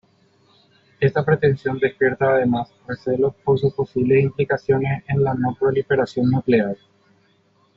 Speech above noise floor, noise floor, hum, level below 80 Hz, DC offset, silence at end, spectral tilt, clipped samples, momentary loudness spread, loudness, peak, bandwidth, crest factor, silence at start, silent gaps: 41 dB; -60 dBFS; none; -54 dBFS; under 0.1%; 1 s; -7 dB/octave; under 0.1%; 5 LU; -20 LUFS; -4 dBFS; 7 kHz; 16 dB; 1 s; none